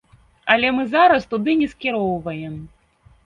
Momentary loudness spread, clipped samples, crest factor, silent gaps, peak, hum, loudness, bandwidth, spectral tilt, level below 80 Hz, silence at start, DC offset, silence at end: 15 LU; under 0.1%; 20 dB; none; 0 dBFS; none; -19 LUFS; 7.4 kHz; -6.5 dB/octave; -52 dBFS; 0.45 s; under 0.1%; 0.6 s